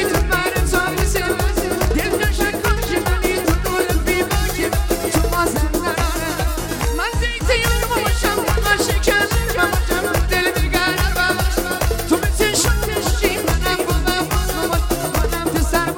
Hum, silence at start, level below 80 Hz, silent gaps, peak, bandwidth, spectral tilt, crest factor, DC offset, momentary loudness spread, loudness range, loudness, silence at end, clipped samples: none; 0 s; -22 dBFS; none; -2 dBFS; 17 kHz; -4 dB/octave; 16 dB; under 0.1%; 3 LU; 2 LU; -18 LUFS; 0 s; under 0.1%